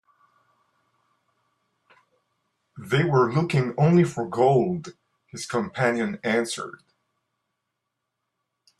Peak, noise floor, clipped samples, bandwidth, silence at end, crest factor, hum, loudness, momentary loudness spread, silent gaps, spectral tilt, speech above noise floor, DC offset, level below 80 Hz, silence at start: -8 dBFS; -81 dBFS; under 0.1%; 12.5 kHz; 2.1 s; 20 dB; none; -23 LUFS; 17 LU; none; -6.5 dB/octave; 59 dB; under 0.1%; -64 dBFS; 2.75 s